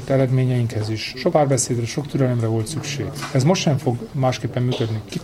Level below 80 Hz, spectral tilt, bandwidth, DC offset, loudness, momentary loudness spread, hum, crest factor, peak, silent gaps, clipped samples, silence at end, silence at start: -48 dBFS; -5.5 dB/octave; 13 kHz; under 0.1%; -21 LUFS; 7 LU; none; 16 dB; -4 dBFS; none; under 0.1%; 0 s; 0 s